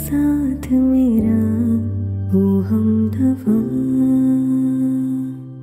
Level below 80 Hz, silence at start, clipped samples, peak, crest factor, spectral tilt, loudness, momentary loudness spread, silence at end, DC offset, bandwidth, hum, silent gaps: -40 dBFS; 0 s; under 0.1%; -6 dBFS; 10 dB; -9.5 dB/octave; -17 LUFS; 5 LU; 0 s; under 0.1%; 15.5 kHz; none; none